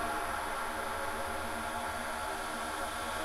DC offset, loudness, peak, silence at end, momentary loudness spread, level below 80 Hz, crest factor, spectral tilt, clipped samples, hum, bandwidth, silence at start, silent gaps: under 0.1%; -36 LUFS; -24 dBFS; 0 s; 1 LU; -50 dBFS; 14 dB; -2.5 dB/octave; under 0.1%; none; 16 kHz; 0 s; none